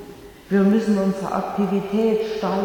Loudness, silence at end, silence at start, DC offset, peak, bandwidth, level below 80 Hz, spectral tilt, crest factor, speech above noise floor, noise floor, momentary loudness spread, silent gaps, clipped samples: -21 LUFS; 0 s; 0 s; under 0.1%; -8 dBFS; 18 kHz; -52 dBFS; -7.5 dB/octave; 14 dB; 21 dB; -41 dBFS; 7 LU; none; under 0.1%